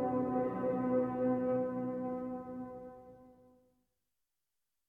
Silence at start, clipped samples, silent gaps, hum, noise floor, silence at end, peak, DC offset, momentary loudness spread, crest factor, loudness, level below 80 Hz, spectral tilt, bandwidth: 0 s; under 0.1%; none; none; -89 dBFS; 1.55 s; -22 dBFS; under 0.1%; 15 LU; 16 dB; -36 LUFS; -68 dBFS; -10.5 dB/octave; 3 kHz